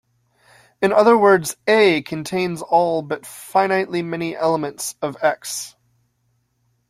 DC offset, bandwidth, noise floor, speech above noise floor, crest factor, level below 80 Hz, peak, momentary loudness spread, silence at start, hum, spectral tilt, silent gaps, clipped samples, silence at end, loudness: under 0.1%; 15.5 kHz; -67 dBFS; 49 dB; 18 dB; -64 dBFS; -2 dBFS; 13 LU; 0.8 s; none; -4.5 dB/octave; none; under 0.1%; 1.2 s; -19 LUFS